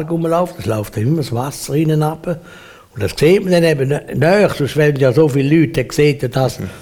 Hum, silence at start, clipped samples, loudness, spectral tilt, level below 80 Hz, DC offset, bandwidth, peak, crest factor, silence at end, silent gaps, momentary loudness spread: none; 0 s; under 0.1%; -15 LUFS; -6.5 dB/octave; -42 dBFS; under 0.1%; 17.5 kHz; -2 dBFS; 14 dB; 0 s; none; 9 LU